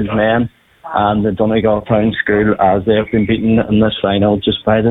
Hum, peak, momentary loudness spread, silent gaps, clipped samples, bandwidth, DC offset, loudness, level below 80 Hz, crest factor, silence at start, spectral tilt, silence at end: none; -2 dBFS; 3 LU; none; under 0.1%; 4 kHz; under 0.1%; -14 LUFS; -38 dBFS; 12 dB; 0 s; -9.5 dB/octave; 0 s